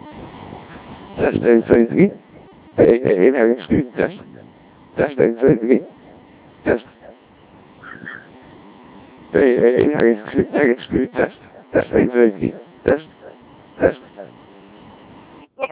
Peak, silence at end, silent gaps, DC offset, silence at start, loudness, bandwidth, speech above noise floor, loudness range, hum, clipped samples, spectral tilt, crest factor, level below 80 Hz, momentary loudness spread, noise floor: 0 dBFS; 0.05 s; none; under 0.1%; 0.05 s; -17 LUFS; 4 kHz; 31 dB; 9 LU; none; under 0.1%; -11.5 dB/octave; 18 dB; -46 dBFS; 23 LU; -47 dBFS